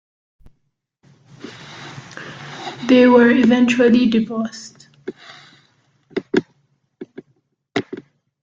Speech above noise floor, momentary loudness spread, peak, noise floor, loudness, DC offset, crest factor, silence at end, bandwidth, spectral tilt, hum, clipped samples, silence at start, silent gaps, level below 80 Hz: 57 dB; 26 LU; -2 dBFS; -70 dBFS; -16 LUFS; under 0.1%; 18 dB; 0.45 s; 7.6 kHz; -5.5 dB/octave; none; under 0.1%; 1.45 s; none; -58 dBFS